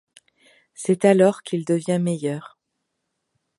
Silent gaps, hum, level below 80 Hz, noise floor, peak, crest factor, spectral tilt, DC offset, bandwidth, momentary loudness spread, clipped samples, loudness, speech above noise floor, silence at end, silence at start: none; none; -72 dBFS; -78 dBFS; -2 dBFS; 20 dB; -6.5 dB/octave; under 0.1%; 11.5 kHz; 13 LU; under 0.1%; -21 LUFS; 58 dB; 1.1 s; 0.8 s